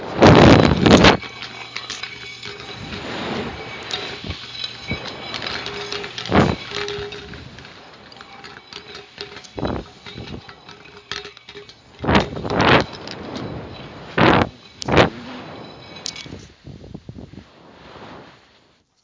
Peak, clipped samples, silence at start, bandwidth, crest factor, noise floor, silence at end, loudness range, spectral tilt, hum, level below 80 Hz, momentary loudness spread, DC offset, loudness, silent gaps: 0 dBFS; under 0.1%; 0 s; 7.6 kHz; 20 dB; -57 dBFS; 0.8 s; 14 LU; -5.5 dB/octave; none; -36 dBFS; 26 LU; under 0.1%; -18 LUFS; none